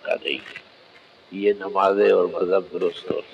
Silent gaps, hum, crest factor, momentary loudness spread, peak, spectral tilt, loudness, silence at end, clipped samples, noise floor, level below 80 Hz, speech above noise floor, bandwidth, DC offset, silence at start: none; none; 16 dB; 16 LU; -6 dBFS; -6 dB/octave; -22 LUFS; 0.1 s; under 0.1%; -51 dBFS; -68 dBFS; 29 dB; 8.8 kHz; under 0.1%; 0.05 s